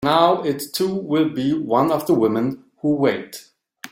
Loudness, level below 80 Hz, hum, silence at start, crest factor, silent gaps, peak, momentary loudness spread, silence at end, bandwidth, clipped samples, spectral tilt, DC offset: -20 LUFS; -60 dBFS; none; 0 s; 18 dB; none; -2 dBFS; 11 LU; 0.05 s; 16.5 kHz; under 0.1%; -6 dB/octave; under 0.1%